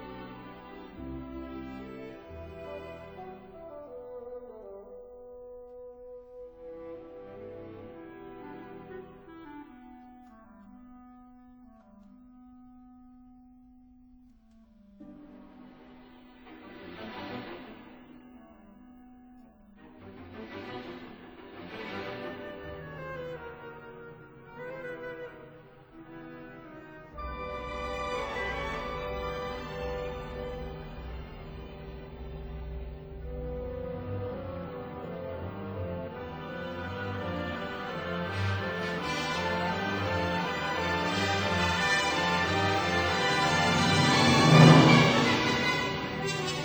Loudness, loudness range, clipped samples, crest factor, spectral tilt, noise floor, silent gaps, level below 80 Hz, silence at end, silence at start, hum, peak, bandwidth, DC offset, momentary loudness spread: -28 LUFS; 23 LU; under 0.1%; 28 dB; -5 dB/octave; -58 dBFS; none; -50 dBFS; 0 s; 0 s; none; -4 dBFS; over 20 kHz; under 0.1%; 22 LU